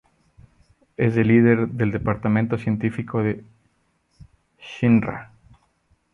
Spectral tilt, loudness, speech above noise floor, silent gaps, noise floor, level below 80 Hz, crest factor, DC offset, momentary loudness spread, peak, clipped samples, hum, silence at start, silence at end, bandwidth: -9.5 dB/octave; -21 LUFS; 47 dB; none; -67 dBFS; -50 dBFS; 18 dB; under 0.1%; 16 LU; -4 dBFS; under 0.1%; none; 1 s; 0.9 s; 6.4 kHz